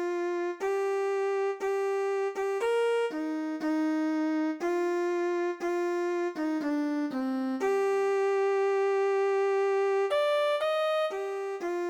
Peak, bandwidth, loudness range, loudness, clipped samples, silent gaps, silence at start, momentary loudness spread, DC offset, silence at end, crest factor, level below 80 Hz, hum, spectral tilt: -18 dBFS; 12.5 kHz; 3 LU; -29 LUFS; under 0.1%; none; 0 s; 4 LU; under 0.1%; 0 s; 10 dB; -76 dBFS; none; -3.5 dB/octave